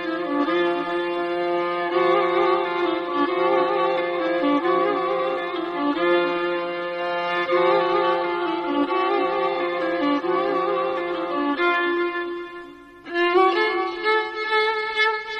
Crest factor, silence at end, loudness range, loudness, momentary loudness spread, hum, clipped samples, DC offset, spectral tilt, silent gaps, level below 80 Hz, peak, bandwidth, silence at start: 14 dB; 0 s; 2 LU; -22 LUFS; 6 LU; none; under 0.1%; under 0.1%; -5.5 dB/octave; none; -64 dBFS; -8 dBFS; 6.4 kHz; 0 s